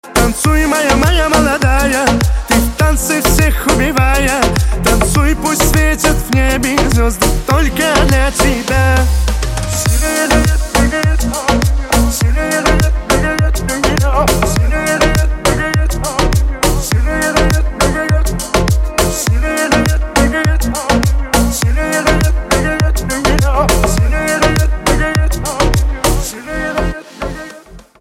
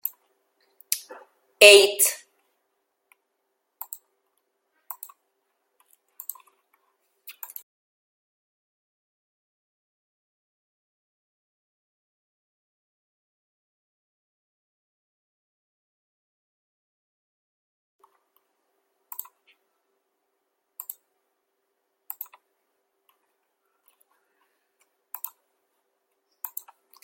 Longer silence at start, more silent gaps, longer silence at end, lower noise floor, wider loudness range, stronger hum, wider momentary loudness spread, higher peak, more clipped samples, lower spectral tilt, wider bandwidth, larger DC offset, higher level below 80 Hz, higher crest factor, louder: about the same, 0.05 s vs 0.05 s; neither; second, 0.2 s vs 24.9 s; second, -35 dBFS vs -77 dBFS; second, 2 LU vs 28 LU; neither; second, 4 LU vs 28 LU; about the same, 0 dBFS vs 0 dBFS; neither; first, -4.5 dB/octave vs 1 dB/octave; about the same, 16.5 kHz vs 16.5 kHz; neither; first, -16 dBFS vs -82 dBFS; second, 12 dB vs 30 dB; first, -13 LUFS vs -16 LUFS